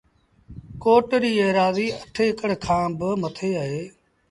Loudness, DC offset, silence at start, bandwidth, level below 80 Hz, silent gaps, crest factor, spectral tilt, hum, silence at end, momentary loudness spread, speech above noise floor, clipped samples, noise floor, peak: -22 LUFS; under 0.1%; 0.5 s; 11.5 kHz; -52 dBFS; none; 18 dB; -6 dB/octave; none; 0.4 s; 10 LU; 27 dB; under 0.1%; -49 dBFS; -4 dBFS